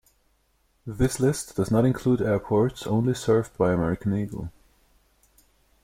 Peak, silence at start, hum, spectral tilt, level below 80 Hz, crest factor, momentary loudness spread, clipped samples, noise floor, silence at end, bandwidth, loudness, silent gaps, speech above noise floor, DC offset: -10 dBFS; 0.85 s; none; -7 dB/octave; -46 dBFS; 16 dB; 12 LU; under 0.1%; -67 dBFS; 1.35 s; 16 kHz; -24 LUFS; none; 44 dB; under 0.1%